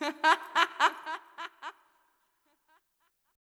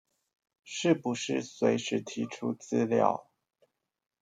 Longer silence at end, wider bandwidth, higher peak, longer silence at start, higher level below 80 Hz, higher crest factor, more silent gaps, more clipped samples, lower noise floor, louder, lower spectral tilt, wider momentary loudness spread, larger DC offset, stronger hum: first, 1.7 s vs 1 s; first, 15.5 kHz vs 9.4 kHz; about the same, -8 dBFS vs -8 dBFS; second, 0 s vs 0.65 s; second, under -90 dBFS vs -78 dBFS; about the same, 24 dB vs 24 dB; neither; neither; about the same, -76 dBFS vs -73 dBFS; about the same, -28 LUFS vs -30 LUFS; second, 0.5 dB/octave vs -5 dB/octave; first, 19 LU vs 9 LU; neither; neither